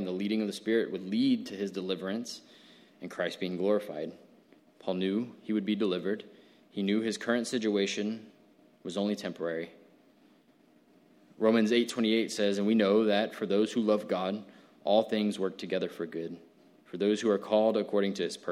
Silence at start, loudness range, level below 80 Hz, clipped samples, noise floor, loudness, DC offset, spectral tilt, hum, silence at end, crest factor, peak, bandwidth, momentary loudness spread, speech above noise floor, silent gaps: 0 s; 7 LU; -80 dBFS; under 0.1%; -63 dBFS; -30 LUFS; under 0.1%; -5.5 dB/octave; none; 0 s; 20 dB; -12 dBFS; 14 kHz; 13 LU; 34 dB; none